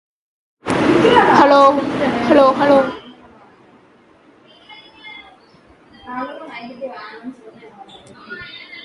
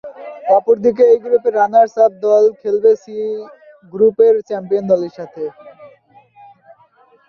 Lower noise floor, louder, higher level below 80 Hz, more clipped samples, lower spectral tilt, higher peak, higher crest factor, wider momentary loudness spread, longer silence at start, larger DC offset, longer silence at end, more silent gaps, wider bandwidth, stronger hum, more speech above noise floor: about the same, -50 dBFS vs -51 dBFS; about the same, -13 LUFS vs -14 LUFS; first, -52 dBFS vs -64 dBFS; neither; second, -5.5 dB/octave vs -7 dB/octave; about the same, 0 dBFS vs -2 dBFS; about the same, 18 dB vs 14 dB; first, 25 LU vs 15 LU; first, 0.65 s vs 0.05 s; neither; second, 0.05 s vs 1.4 s; neither; first, 11.5 kHz vs 6.8 kHz; neither; about the same, 36 dB vs 38 dB